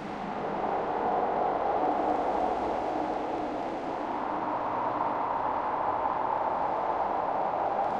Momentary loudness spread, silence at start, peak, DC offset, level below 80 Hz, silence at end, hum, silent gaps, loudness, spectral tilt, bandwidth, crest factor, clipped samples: 5 LU; 0 s; -16 dBFS; under 0.1%; -58 dBFS; 0 s; none; none; -30 LUFS; -6.5 dB/octave; 8.8 kHz; 14 dB; under 0.1%